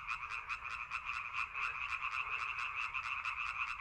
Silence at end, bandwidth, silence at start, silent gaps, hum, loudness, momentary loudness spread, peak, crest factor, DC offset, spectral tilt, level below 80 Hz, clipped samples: 0 s; 13 kHz; 0 s; none; none; -39 LUFS; 3 LU; -24 dBFS; 18 dB; under 0.1%; -0.5 dB/octave; -64 dBFS; under 0.1%